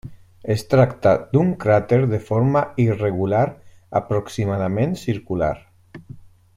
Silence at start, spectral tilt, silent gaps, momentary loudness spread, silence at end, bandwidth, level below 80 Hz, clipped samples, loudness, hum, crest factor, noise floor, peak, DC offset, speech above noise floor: 0.05 s; -8 dB/octave; none; 8 LU; 0.35 s; 14.5 kHz; -48 dBFS; under 0.1%; -20 LUFS; none; 18 dB; -42 dBFS; -2 dBFS; under 0.1%; 23 dB